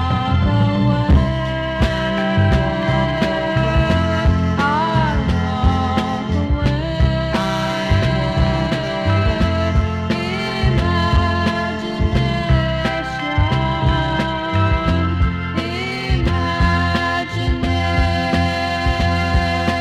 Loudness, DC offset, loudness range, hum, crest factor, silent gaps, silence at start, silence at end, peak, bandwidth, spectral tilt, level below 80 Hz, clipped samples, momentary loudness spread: -18 LUFS; under 0.1%; 1 LU; none; 16 dB; none; 0 s; 0 s; -2 dBFS; 10.5 kHz; -7 dB/octave; -24 dBFS; under 0.1%; 4 LU